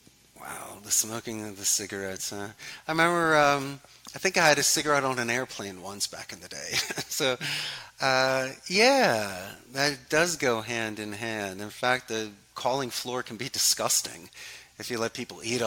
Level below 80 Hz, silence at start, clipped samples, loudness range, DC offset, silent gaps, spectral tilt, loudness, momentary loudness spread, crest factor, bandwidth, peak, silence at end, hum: -64 dBFS; 0.35 s; under 0.1%; 4 LU; under 0.1%; none; -2 dB/octave; -26 LUFS; 17 LU; 22 dB; 17 kHz; -6 dBFS; 0 s; none